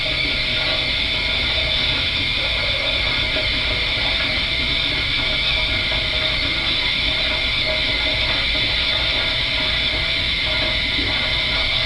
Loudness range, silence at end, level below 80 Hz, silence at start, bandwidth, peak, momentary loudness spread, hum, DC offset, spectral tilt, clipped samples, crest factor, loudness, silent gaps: 0 LU; 0 s; -32 dBFS; 0 s; 11 kHz; -6 dBFS; 1 LU; none; under 0.1%; -3.5 dB/octave; under 0.1%; 14 dB; -17 LUFS; none